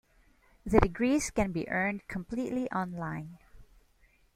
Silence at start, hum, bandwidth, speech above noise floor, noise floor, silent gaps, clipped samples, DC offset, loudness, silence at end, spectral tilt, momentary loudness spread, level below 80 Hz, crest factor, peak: 0.65 s; none; 16 kHz; 35 dB; -65 dBFS; none; under 0.1%; under 0.1%; -31 LUFS; 0.7 s; -6 dB/octave; 12 LU; -46 dBFS; 28 dB; -4 dBFS